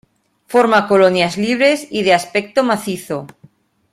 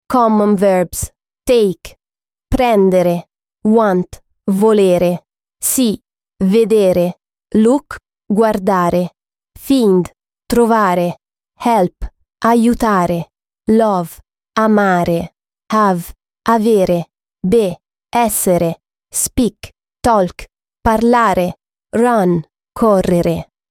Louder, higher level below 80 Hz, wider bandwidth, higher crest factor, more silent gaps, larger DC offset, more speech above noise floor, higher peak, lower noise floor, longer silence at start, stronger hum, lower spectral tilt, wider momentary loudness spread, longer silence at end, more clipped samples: about the same, -15 LUFS vs -15 LUFS; second, -58 dBFS vs -38 dBFS; about the same, 15.5 kHz vs 17 kHz; about the same, 16 dB vs 14 dB; neither; neither; second, 35 dB vs over 77 dB; about the same, 0 dBFS vs -2 dBFS; second, -50 dBFS vs under -90 dBFS; first, 0.5 s vs 0.1 s; neither; about the same, -4.5 dB/octave vs -5.5 dB/octave; second, 11 LU vs 14 LU; first, 0.65 s vs 0.3 s; neither